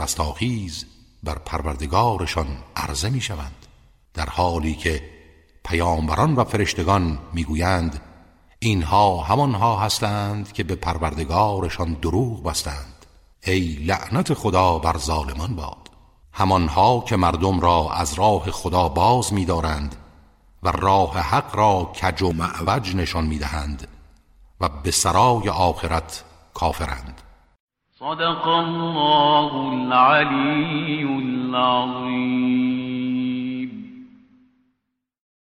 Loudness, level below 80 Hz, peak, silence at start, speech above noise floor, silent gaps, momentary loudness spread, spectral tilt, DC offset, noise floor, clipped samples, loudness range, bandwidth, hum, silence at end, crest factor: -21 LUFS; -36 dBFS; -4 dBFS; 0 s; 56 dB; 27.60-27.67 s; 13 LU; -5 dB/octave; under 0.1%; -77 dBFS; under 0.1%; 6 LU; 16 kHz; none; 1.35 s; 18 dB